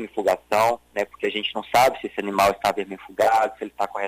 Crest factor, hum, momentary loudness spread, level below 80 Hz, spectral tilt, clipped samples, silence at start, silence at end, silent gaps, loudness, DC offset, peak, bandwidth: 16 dB; none; 10 LU; -56 dBFS; -3.5 dB/octave; under 0.1%; 0 s; 0 s; none; -22 LUFS; under 0.1%; -8 dBFS; 16 kHz